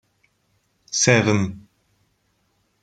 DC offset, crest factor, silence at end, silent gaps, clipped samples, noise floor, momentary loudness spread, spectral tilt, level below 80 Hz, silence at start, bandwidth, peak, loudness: under 0.1%; 24 dB; 1.25 s; none; under 0.1%; -67 dBFS; 15 LU; -4 dB/octave; -58 dBFS; 0.9 s; 10 kHz; 0 dBFS; -19 LUFS